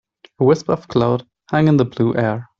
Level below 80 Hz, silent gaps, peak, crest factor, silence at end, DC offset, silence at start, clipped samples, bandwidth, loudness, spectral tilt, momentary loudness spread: -52 dBFS; none; -2 dBFS; 16 dB; 0.15 s; under 0.1%; 0.4 s; under 0.1%; 7.4 kHz; -18 LUFS; -8 dB/octave; 5 LU